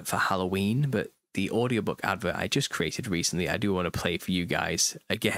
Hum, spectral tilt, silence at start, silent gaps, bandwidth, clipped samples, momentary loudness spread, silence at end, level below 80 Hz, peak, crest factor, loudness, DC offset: none; -4 dB/octave; 0 s; none; 16 kHz; under 0.1%; 3 LU; 0 s; -54 dBFS; -10 dBFS; 20 dB; -28 LUFS; under 0.1%